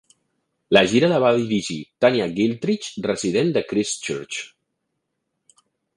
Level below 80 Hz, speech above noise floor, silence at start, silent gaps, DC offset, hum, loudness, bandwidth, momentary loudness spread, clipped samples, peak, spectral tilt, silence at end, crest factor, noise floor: -60 dBFS; 57 dB; 0.7 s; none; under 0.1%; none; -21 LUFS; 11.5 kHz; 11 LU; under 0.1%; 0 dBFS; -4.5 dB/octave; 1.5 s; 22 dB; -77 dBFS